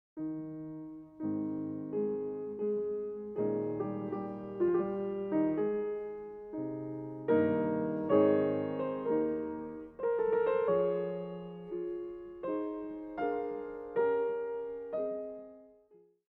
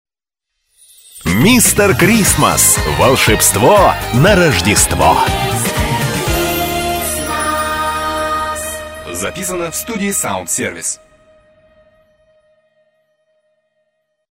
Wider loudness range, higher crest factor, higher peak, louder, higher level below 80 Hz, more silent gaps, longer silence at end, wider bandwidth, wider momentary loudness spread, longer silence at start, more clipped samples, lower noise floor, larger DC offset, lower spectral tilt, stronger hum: second, 5 LU vs 11 LU; first, 20 dB vs 14 dB; second, -14 dBFS vs 0 dBFS; second, -34 LUFS vs -12 LUFS; second, -68 dBFS vs -30 dBFS; neither; second, 0.65 s vs 3.4 s; second, 4.2 kHz vs 16.5 kHz; about the same, 12 LU vs 11 LU; second, 0.15 s vs 1.15 s; neither; second, -64 dBFS vs -79 dBFS; neither; first, -10.5 dB/octave vs -3.5 dB/octave; neither